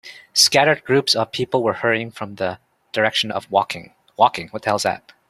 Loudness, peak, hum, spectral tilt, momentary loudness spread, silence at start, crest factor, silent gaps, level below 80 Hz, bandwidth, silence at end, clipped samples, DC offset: -19 LUFS; 0 dBFS; none; -2.5 dB/octave; 13 LU; 0.05 s; 20 dB; none; -62 dBFS; 16 kHz; 0.3 s; under 0.1%; under 0.1%